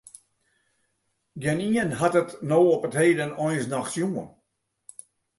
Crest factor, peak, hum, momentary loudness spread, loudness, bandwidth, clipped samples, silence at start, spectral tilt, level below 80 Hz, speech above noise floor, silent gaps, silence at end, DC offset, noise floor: 18 dB; -8 dBFS; none; 24 LU; -24 LUFS; 11.5 kHz; under 0.1%; 1.35 s; -6 dB/octave; -64 dBFS; 53 dB; none; 1.1 s; under 0.1%; -76 dBFS